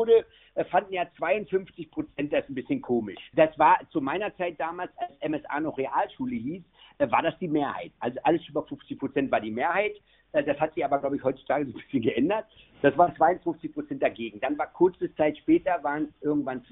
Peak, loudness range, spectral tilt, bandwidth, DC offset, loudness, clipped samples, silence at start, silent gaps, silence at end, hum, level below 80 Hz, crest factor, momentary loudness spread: -6 dBFS; 3 LU; -4.5 dB/octave; 4 kHz; under 0.1%; -27 LUFS; under 0.1%; 0 s; none; 0.1 s; none; -62 dBFS; 22 dB; 11 LU